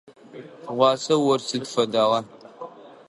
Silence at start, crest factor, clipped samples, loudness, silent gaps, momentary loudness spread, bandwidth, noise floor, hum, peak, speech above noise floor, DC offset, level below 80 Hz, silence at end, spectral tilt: 0.35 s; 20 dB; under 0.1%; -22 LUFS; none; 21 LU; 11.5 kHz; -42 dBFS; none; -4 dBFS; 21 dB; under 0.1%; -74 dBFS; 0.2 s; -4.5 dB/octave